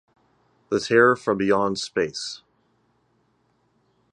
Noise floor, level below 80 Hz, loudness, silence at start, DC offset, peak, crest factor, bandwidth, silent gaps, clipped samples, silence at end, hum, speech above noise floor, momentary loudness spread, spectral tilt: -67 dBFS; -62 dBFS; -22 LUFS; 0.7 s; under 0.1%; -4 dBFS; 22 dB; 10.5 kHz; none; under 0.1%; 1.75 s; none; 45 dB; 15 LU; -4.5 dB/octave